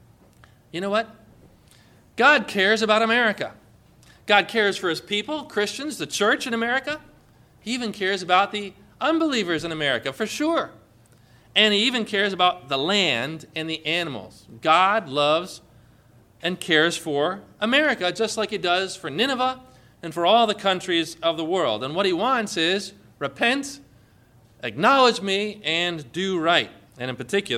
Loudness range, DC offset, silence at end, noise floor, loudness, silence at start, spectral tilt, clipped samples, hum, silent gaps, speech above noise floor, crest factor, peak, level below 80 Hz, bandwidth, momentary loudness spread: 3 LU; under 0.1%; 0 s; -55 dBFS; -22 LUFS; 0.75 s; -3.5 dB/octave; under 0.1%; none; none; 32 dB; 20 dB; -2 dBFS; -62 dBFS; 15.5 kHz; 14 LU